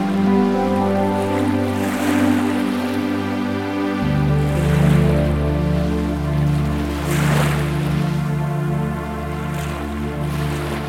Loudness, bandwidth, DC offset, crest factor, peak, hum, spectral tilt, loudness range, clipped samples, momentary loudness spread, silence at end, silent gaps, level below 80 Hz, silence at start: -19 LUFS; 16 kHz; 0.4%; 14 dB; -4 dBFS; none; -7 dB/octave; 3 LU; under 0.1%; 8 LU; 0 s; none; -30 dBFS; 0 s